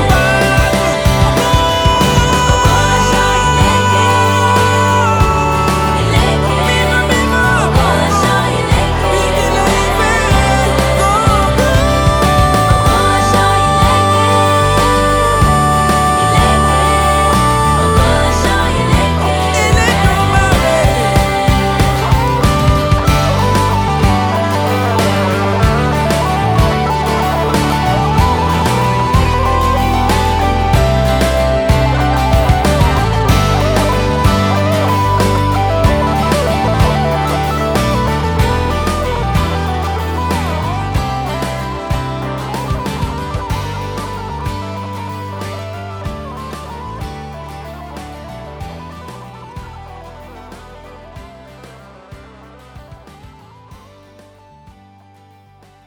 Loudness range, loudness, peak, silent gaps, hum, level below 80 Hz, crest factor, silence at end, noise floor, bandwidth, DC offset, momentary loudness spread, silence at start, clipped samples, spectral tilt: 13 LU; -12 LUFS; 0 dBFS; none; none; -20 dBFS; 12 dB; 2.1 s; -45 dBFS; over 20 kHz; under 0.1%; 13 LU; 0 s; under 0.1%; -5 dB/octave